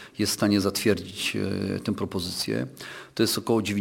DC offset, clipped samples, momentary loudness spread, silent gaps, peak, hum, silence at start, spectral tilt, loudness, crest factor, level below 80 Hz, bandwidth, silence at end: under 0.1%; under 0.1%; 7 LU; none; -8 dBFS; none; 0 s; -4.5 dB/octave; -26 LUFS; 18 dB; -60 dBFS; 17 kHz; 0 s